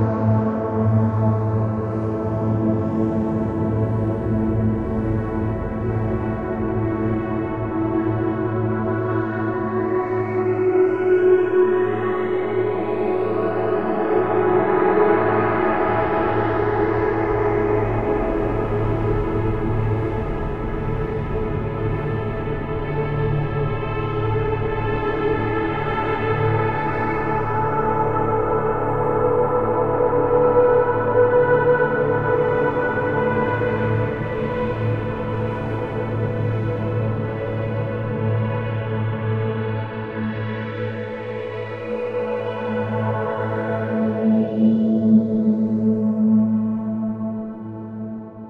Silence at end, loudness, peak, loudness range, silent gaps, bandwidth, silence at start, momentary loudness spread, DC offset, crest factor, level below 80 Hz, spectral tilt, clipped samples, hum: 0 s; -21 LUFS; -6 dBFS; 6 LU; none; 4.7 kHz; 0 s; 8 LU; 0.3%; 16 dB; -36 dBFS; -10 dB/octave; under 0.1%; none